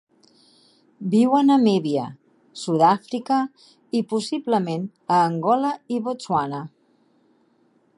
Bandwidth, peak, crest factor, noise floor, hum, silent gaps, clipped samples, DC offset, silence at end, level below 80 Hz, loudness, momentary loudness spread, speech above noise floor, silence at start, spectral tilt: 11.5 kHz; -4 dBFS; 18 dB; -62 dBFS; none; none; under 0.1%; under 0.1%; 1.3 s; -70 dBFS; -22 LUFS; 15 LU; 41 dB; 1 s; -6.5 dB/octave